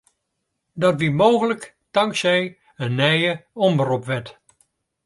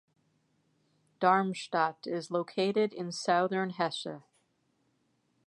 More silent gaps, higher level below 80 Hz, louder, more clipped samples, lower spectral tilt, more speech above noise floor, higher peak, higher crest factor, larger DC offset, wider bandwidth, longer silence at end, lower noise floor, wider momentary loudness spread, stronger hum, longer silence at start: neither; first, -62 dBFS vs -86 dBFS; first, -20 LUFS vs -31 LUFS; neither; about the same, -5.5 dB/octave vs -5 dB/octave; first, 57 dB vs 44 dB; first, -2 dBFS vs -10 dBFS; about the same, 20 dB vs 22 dB; neither; about the same, 11.5 kHz vs 11.5 kHz; second, 0.75 s vs 1.25 s; about the same, -77 dBFS vs -75 dBFS; about the same, 12 LU vs 10 LU; neither; second, 0.75 s vs 1.2 s